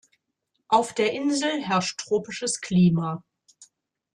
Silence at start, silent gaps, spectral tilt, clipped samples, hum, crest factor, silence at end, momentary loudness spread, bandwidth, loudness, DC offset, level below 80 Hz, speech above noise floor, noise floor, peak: 0.7 s; none; -5 dB/octave; under 0.1%; none; 18 dB; 0.5 s; 8 LU; 11 kHz; -24 LUFS; under 0.1%; -62 dBFS; 54 dB; -78 dBFS; -8 dBFS